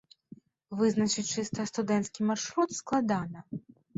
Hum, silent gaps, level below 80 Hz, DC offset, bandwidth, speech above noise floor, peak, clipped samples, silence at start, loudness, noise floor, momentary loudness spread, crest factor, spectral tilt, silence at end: none; none; -68 dBFS; under 0.1%; 8 kHz; 25 dB; -16 dBFS; under 0.1%; 0.7 s; -30 LUFS; -55 dBFS; 13 LU; 16 dB; -4.5 dB/octave; 0.35 s